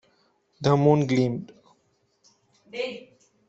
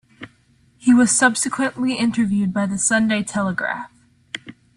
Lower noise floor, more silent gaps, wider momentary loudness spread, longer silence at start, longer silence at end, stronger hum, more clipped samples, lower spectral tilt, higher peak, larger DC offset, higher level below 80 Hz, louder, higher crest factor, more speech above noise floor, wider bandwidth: first, -69 dBFS vs -57 dBFS; neither; about the same, 21 LU vs 19 LU; first, 0.6 s vs 0.2 s; first, 0.5 s vs 0.25 s; neither; neither; first, -7.5 dB/octave vs -3.5 dB/octave; second, -6 dBFS vs -2 dBFS; neither; second, -64 dBFS vs -58 dBFS; second, -24 LUFS vs -18 LUFS; about the same, 20 dB vs 18 dB; first, 46 dB vs 38 dB; second, 7.8 kHz vs 12 kHz